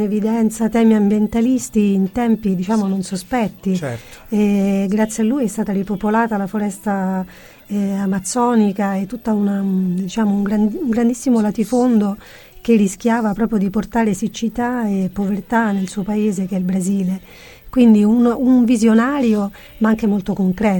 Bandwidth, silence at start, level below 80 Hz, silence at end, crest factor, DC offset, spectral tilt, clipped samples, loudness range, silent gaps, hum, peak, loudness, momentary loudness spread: 17 kHz; 0 s; -46 dBFS; 0 s; 14 dB; under 0.1%; -6.5 dB/octave; under 0.1%; 4 LU; none; none; -2 dBFS; -17 LUFS; 8 LU